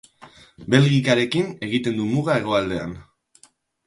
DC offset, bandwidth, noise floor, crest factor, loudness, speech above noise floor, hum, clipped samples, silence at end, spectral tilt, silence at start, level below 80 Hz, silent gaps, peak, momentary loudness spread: under 0.1%; 11.5 kHz; -57 dBFS; 22 dB; -21 LUFS; 37 dB; none; under 0.1%; 0.85 s; -6 dB/octave; 0.2 s; -52 dBFS; none; 0 dBFS; 14 LU